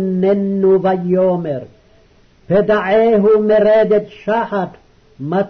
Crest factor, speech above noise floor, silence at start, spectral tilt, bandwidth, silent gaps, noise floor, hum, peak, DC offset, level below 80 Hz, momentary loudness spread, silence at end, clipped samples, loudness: 10 dB; 36 dB; 0 s; -9 dB/octave; 6.2 kHz; none; -49 dBFS; none; -4 dBFS; under 0.1%; -50 dBFS; 10 LU; 0 s; under 0.1%; -14 LUFS